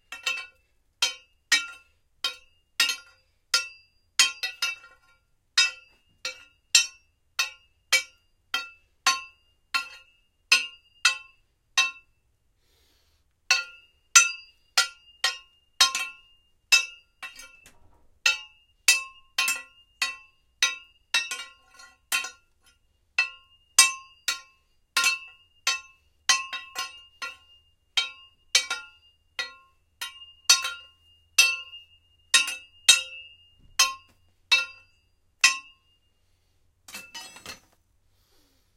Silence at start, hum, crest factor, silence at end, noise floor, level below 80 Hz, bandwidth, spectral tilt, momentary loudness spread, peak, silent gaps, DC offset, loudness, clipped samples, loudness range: 0.1 s; none; 30 dB; 1.2 s; -69 dBFS; -68 dBFS; 16.5 kHz; 4 dB/octave; 20 LU; 0 dBFS; none; under 0.1%; -24 LUFS; under 0.1%; 6 LU